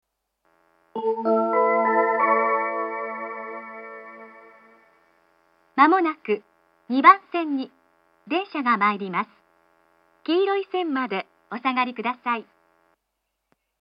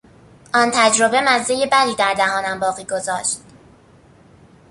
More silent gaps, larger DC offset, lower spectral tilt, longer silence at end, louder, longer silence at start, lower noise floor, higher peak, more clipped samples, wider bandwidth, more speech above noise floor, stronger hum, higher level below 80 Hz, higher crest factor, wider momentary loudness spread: neither; neither; first, -7.5 dB/octave vs -1.5 dB/octave; about the same, 1.35 s vs 1.3 s; second, -22 LUFS vs -17 LUFS; first, 0.95 s vs 0.55 s; first, -78 dBFS vs -49 dBFS; about the same, 0 dBFS vs 0 dBFS; neither; second, 5.4 kHz vs 11.5 kHz; first, 56 dB vs 32 dB; neither; second, -84 dBFS vs -58 dBFS; about the same, 24 dB vs 20 dB; first, 19 LU vs 9 LU